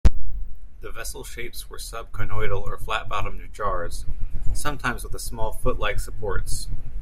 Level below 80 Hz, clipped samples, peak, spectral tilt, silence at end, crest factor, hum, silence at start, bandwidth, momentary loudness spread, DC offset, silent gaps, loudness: -28 dBFS; under 0.1%; -2 dBFS; -4.5 dB/octave; 0 s; 16 dB; none; 0.05 s; 13.5 kHz; 9 LU; under 0.1%; none; -30 LUFS